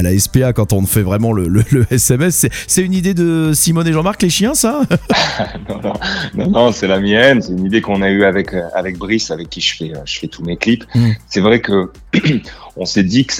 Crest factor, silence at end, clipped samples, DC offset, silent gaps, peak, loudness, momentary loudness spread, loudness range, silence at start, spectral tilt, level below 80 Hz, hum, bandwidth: 14 dB; 0 s; under 0.1%; under 0.1%; none; 0 dBFS; -14 LUFS; 9 LU; 3 LU; 0 s; -4.5 dB/octave; -36 dBFS; none; 18 kHz